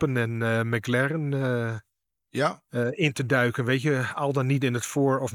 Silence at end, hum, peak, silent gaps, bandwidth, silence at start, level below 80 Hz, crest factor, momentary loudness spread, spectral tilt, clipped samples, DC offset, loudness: 0 s; none; -8 dBFS; none; 17.5 kHz; 0 s; -66 dBFS; 18 dB; 6 LU; -6 dB/octave; under 0.1%; under 0.1%; -26 LUFS